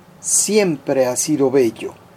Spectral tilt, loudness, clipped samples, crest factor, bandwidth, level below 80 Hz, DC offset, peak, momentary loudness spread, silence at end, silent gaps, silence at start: -3.5 dB/octave; -17 LUFS; under 0.1%; 16 dB; 16 kHz; -62 dBFS; under 0.1%; -2 dBFS; 5 LU; 0.25 s; none; 0.25 s